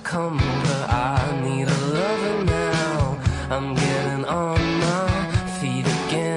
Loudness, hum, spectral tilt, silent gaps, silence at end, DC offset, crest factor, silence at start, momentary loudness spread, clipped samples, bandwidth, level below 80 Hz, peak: -22 LUFS; none; -5.5 dB/octave; none; 0 s; under 0.1%; 12 dB; 0 s; 3 LU; under 0.1%; 11 kHz; -36 dBFS; -8 dBFS